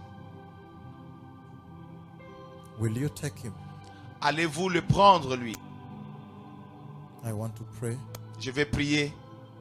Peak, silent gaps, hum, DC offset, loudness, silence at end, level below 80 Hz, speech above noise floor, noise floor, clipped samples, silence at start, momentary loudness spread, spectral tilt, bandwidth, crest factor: -8 dBFS; none; none; under 0.1%; -28 LUFS; 0 s; -54 dBFS; 21 dB; -48 dBFS; under 0.1%; 0 s; 22 LU; -5 dB/octave; 15.5 kHz; 24 dB